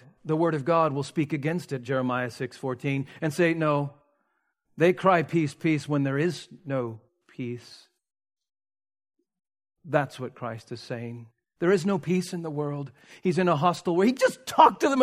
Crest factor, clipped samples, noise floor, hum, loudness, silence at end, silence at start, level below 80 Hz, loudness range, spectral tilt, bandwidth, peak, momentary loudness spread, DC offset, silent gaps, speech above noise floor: 24 dB; under 0.1%; -75 dBFS; none; -26 LUFS; 0 s; 0.25 s; -72 dBFS; 10 LU; -6.5 dB/octave; 15.5 kHz; -2 dBFS; 14 LU; under 0.1%; none; 50 dB